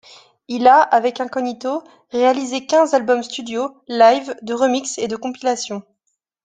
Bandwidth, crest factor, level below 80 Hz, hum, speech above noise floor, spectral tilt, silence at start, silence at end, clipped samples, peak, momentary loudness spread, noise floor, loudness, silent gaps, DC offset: 9.6 kHz; 16 dB; -68 dBFS; none; 55 dB; -3 dB/octave; 0.5 s; 0.65 s; under 0.1%; -2 dBFS; 13 LU; -73 dBFS; -18 LUFS; none; under 0.1%